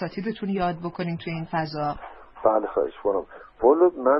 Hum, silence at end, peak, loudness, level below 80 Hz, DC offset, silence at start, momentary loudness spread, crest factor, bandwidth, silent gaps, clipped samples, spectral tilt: none; 0 s; -6 dBFS; -25 LUFS; -54 dBFS; under 0.1%; 0 s; 11 LU; 18 dB; 5.8 kHz; none; under 0.1%; -11 dB/octave